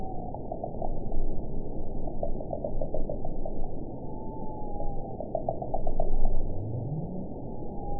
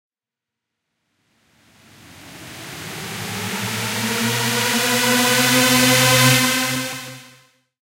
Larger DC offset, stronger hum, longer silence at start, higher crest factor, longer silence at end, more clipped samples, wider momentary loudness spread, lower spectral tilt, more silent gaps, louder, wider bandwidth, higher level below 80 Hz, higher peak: first, 0.9% vs under 0.1%; neither; second, 0 s vs 2.15 s; about the same, 16 dB vs 18 dB; second, 0 s vs 0.6 s; neither; second, 6 LU vs 20 LU; first, -16 dB/octave vs -2.5 dB/octave; neither; second, -36 LUFS vs -16 LUFS; second, 1 kHz vs 16 kHz; first, -30 dBFS vs -56 dBFS; second, -10 dBFS vs -2 dBFS